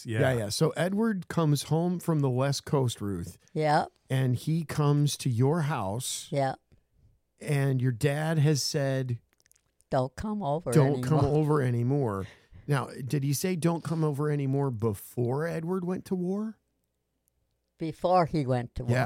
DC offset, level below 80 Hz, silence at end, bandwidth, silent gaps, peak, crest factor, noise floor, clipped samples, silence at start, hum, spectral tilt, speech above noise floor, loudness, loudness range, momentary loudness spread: under 0.1%; -56 dBFS; 0 s; 16 kHz; none; -10 dBFS; 18 dB; -78 dBFS; under 0.1%; 0 s; none; -6 dB/octave; 51 dB; -28 LUFS; 4 LU; 7 LU